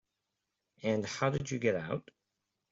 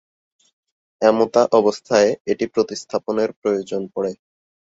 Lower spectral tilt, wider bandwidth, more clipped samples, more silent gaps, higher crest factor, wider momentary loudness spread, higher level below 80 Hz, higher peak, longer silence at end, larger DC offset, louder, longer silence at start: about the same, -5.5 dB/octave vs -4.5 dB/octave; about the same, 8 kHz vs 8 kHz; neither; second, none vs 2.20-2.25 s, 3.36-3.42 s; about the same, 22 dB vs 18 dB; second, 7 LU vs 10 LU; about the same, -66 dBFS vs -62 dBFS; second, -14 dBFS vs -2 dBFS; first, 0.7 s vs 0.55 s; neither; second, -34 LUFS vs -19 LUFS; second, 0.8 s vs 1 s